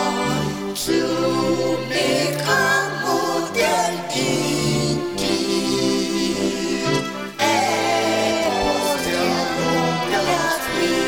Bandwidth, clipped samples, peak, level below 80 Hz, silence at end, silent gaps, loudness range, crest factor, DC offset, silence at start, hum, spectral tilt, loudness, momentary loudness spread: 19 kHz; under 0.1%; -4 dBFS; -48 dBFS; 0 s; none; 1 LU; 16 dB; under 0.1%; 0 s; none; -4 dB/octave; -20 LUFS; 4 LU